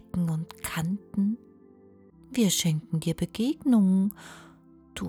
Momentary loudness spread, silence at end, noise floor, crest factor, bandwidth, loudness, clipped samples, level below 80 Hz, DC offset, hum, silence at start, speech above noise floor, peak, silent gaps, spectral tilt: 13 LU; 0 s; -54 dBFS; 16 dB; over 20 kHz; -27 LUFS; under 0.1%; -56 dBFS; under 0.1%; none; 0.15 s; 29 dB; -12 dBFS; none; -5.5 dB/octave